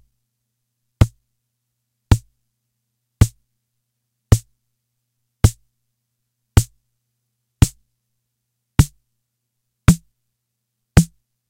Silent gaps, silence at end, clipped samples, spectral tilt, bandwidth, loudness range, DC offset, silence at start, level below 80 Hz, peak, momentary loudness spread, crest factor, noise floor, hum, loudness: none; 0.45 s; under 0.1%; -6 dB/octave; 16 kHz; 3 LU; under 0.1%; 1 s; -30 dBFS; 0 dBFS; 4 LU; 22 dB; -77 dBFS; 60 Hz at -45 dBFS; -19 LUFS